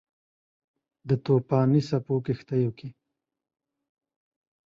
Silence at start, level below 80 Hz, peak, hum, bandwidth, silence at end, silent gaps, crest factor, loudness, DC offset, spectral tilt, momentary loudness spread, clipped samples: 1.05 s; -64 dBFS; -10 dBFS; none; 7.2 kHz; 1.75 s; none; 18 dB; -26 LUFS; under 0.1%; -9 dB/octave; 20 LU; under 0.1%